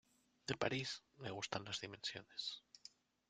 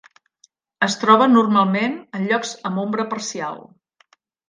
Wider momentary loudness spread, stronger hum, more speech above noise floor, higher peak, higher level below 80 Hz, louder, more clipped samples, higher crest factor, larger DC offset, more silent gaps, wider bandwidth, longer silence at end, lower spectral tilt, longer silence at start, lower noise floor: about the same, 15 LU vs 13 LU; neither; second, 20 dB vs 41 dB; second, -20 dBFS vs 0 dBFS; second, -78 dBFS vs -72 dBFS; second, -45 LUFS vs -19 LUFS; neither; first, 26 dB vs 20 dB; neither; neither; about the same, 9.6 kHz vs 9.8 kHz; second, 0.4 s vs 0.9 s; second, -3.5 dB/octave vs -5 dB/octave; second, 0.45 s vs 0.8 s; first, -66 dBFS vs -60 dBFS